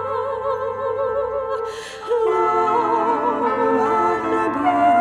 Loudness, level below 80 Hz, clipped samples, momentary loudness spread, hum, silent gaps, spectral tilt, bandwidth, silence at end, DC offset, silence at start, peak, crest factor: -20 LUFS; -54 dBFS; under 0.1%; 7 LU; none; none; -5.5 dB/octave; 11 kHz; 0 s; under 0.1%; 0 s; -6 dBFS; 14 dB